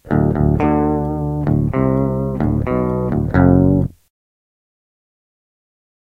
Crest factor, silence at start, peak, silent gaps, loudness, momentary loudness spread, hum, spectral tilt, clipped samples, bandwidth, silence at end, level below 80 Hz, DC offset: 16 dB; 0.05 s; 0 dBFS; none; -17 LUFS; 7 LU; none; -11 dB/octave; under 0.1%; 4.2 kHz; 2.15 s; -30 dBFS; under 0.1%